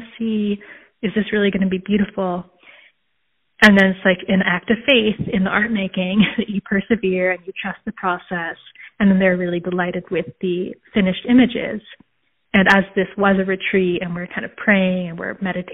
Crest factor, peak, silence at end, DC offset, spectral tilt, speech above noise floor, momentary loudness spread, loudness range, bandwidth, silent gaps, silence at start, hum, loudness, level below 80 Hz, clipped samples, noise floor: 18 dB; 0 dBFS; 0 s; under 0.1%; -4 dB/octave; 53 dB; 11 LU; 5 LU; 4.5 kHz; none; 0 s; none; -18 LUFS; -50 dBFS; under 0.1%; -71 dBFS